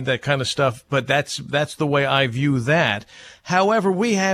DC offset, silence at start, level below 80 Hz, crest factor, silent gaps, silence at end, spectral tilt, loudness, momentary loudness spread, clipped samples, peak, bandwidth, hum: under 0.1%; 0 s; -56 dBFS; 16 dB; none; 0 s; -5 dB/octave; -20 LUFS; 6 LU; under 0.1%; -6 dBFS; 14.5 kHz; none